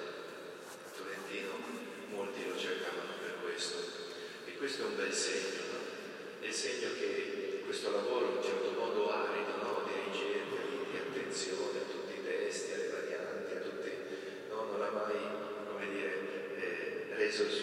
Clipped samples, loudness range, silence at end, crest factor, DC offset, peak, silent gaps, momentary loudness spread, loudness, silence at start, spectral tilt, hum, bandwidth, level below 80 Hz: under 0.1%; 4 LU; 0 s; 18 dB; under 0.1%; -22 dBFS; none; 10 LU; -38 LUFS; 0 s; -2.5 dB/octave; none; 16 kHz; -86 dBFS